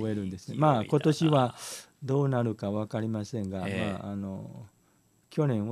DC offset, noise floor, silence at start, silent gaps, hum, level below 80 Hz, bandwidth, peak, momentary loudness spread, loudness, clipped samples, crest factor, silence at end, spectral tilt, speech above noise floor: under 0.1%; -66 dBFS; 0 s; none; none; -66 dBFS; 13.5 kHz; -8 dBFS; 15 LU; -29 LUFS; under 0.1%; 20 dB; 0 s; -7 dB/octave; 38 dB